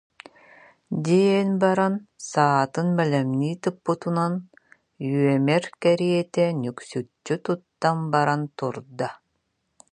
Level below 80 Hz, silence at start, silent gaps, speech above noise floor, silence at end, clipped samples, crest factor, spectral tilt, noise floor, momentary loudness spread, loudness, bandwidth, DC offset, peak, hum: -70 dBFS; 0.9 s; none; 51 dB; 0.75 s; under 0.1%; 20 dB; -6.5 dB/octave; -74 dBFS; 11 LU; -24 LUFS; 10.5 kHz; under 0.1%; -4 dBFS; none